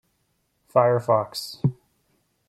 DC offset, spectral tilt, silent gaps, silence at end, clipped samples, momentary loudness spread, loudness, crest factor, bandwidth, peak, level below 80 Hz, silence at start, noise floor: under 0.1%; -6.5 dB/octave; none; 0.75 s; under 0.1%; 8 LU; -23 LUFS; 22 dB; 15 kHz; -4 dBFS; -62 dBFS; 0.75 s; -71 dBFS